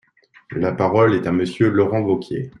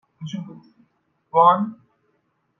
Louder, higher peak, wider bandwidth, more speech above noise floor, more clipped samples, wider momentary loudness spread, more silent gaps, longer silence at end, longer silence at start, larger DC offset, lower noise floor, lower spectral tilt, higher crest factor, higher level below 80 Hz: about the same, -19 LUFS vs -18 LUFS; about the same, -4 dBFS vs -4 dBFS; first, 11 kHz vs 6.8 kHz; second, 30 dB vs 49 dB; neither; second, 8 LU vs 18 LU; neither; second, 0.1 s vs 0.85 s; first, 0.5 s vs 0.2 s; neither; second, -48 dBFS vs -69 dBFS; about the same, -8 dB/octave vs -7.5 dB/octave; about the same, 16 dB vs 20 dB; first, -56 dBFS vs -76 dBFS